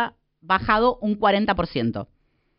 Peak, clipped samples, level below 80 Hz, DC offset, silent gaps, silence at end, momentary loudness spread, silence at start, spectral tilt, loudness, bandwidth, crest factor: -6 dBFS; under 0.1%; -44 dBFS; under 0.1%; none; 0.55 s; 10 LU; 0 s; -3.5 dB/octave; -22 LUFS; 5.6 kHz; 18 dB